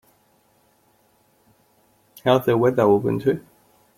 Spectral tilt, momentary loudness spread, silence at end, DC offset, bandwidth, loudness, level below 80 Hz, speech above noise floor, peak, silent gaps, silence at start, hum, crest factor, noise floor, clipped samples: -7.5 dB/octave; 8 LU; 0.6 s; under 0.1%; 16.5 kHz; -20 LUFS; -60 dBFS; 43 dB; -2 dBFS; none; 2.25 s; none; 20 dB; -61 dBFS; under 0.1%